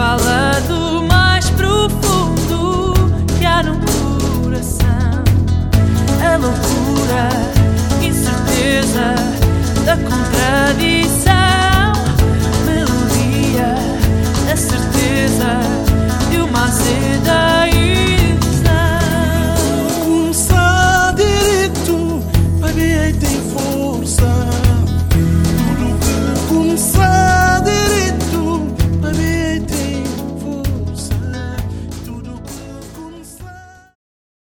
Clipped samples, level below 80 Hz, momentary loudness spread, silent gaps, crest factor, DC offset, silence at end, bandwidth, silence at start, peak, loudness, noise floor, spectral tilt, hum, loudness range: under 0.1%; -22 dBFS; 9 LU; none; 14 dB; under 0.1%; 0.9 s; 19 kHz; 0 s; 0 dBFS; -14 LUFS; -37 dBFS; -5 dB/octave; none; 5 LU